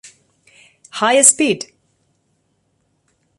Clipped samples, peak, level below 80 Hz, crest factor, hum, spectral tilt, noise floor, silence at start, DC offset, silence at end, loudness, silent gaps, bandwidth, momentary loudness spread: under 0.1%; 0 dBFS; -68 dBFS; 20 dB; none; -1.5 dB/octave; -65 dBFS; 0.95 s; under 0.1%; 1.75 s; -13 LUFS; none; 16 kHz; 22 LU